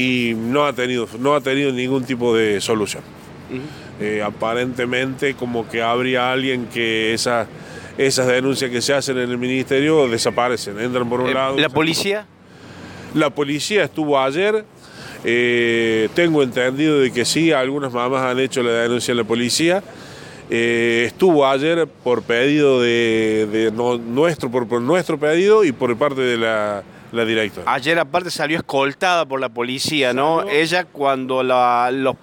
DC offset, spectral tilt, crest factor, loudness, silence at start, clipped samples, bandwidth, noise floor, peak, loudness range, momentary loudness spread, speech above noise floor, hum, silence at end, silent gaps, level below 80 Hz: under 0.1%; -4.5 dB/octave; 14 dB; -18 LUFS; 0 s; under 0.1%; 17 kHz; -39 dBFS; -4 dBFS; 4 LU; 7 LU; 21 dB; none; 0.1 s; none; -58 dBFS